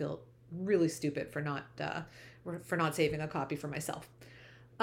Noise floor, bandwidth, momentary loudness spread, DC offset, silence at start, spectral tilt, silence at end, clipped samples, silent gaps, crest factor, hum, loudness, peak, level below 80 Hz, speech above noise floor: -56 dBFS; 17 kHz; 22 LU; under 0.1%; 0 s; -5.5 dB/octave; 0 s; under 0.1%; none; 20 dB; none; -36 LUFS; -18 dBFS; -66 dBFS; 21 dB